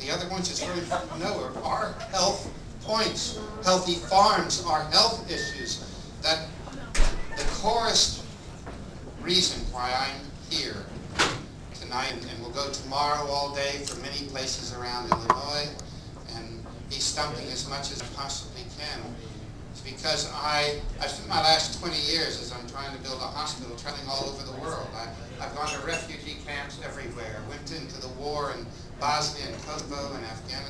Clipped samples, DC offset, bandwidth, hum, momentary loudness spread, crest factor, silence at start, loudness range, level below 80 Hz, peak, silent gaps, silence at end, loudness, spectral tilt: under 0.1%; under 0.1%; 11 kHz; none; 16 LU; 26 dB; 0 s; 9 LU; -40 dBFS; -4 dBFS; none; 0 s; -28 LUFS; -2.5 dB/octave